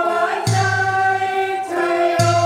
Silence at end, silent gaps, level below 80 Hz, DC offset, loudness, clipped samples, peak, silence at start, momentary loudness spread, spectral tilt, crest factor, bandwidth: 0 s; none; -56 dBFS; under 0.1%; -18 LUFS; under 0.1%; -2 dBFS; 0 s; 4 LU; -5 dB/octave; 16 dB; 15.5 kHz